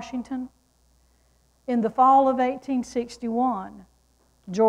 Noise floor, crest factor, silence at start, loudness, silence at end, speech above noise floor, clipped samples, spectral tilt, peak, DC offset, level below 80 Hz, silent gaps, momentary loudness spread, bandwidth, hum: -63 dBFS; 18 dB; 0 s; -24 LUFS; 0 s; 40 dB; under 0.1%; -6 dB/octave; -8 dBFS; under 0.1%; -60 dBFS; none; 17 LU; 11 kHz; none